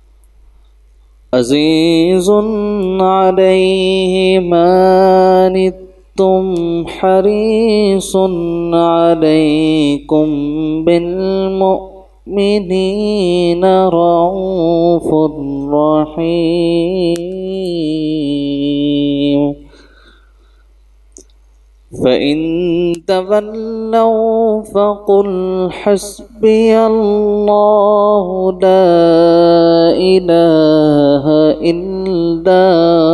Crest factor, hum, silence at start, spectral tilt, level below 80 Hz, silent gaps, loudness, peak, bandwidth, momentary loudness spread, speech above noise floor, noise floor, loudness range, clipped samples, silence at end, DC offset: 12 dB; none; 1.3 s; -6.5 dB/octave; -40 dBFS; none; -12 LUFS; 0 dBFS; 12.5 kHz; 8 LU; 35 dB; -45 dBFS; 7 LU; under 0.1%; 0 s; under 0.1%